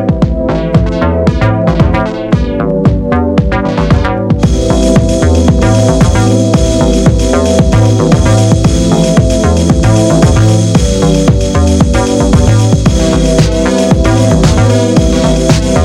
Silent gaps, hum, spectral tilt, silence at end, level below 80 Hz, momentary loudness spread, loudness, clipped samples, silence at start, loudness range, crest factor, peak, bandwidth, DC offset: none; none; -6.5 dB/octave; 0 s; -16 dBFS; 3 LU; -9 LUFS; under 0.1%; 0 s; 2 LU; 8 dB; 0 dBFS; 12.5 kHz; under 0.1%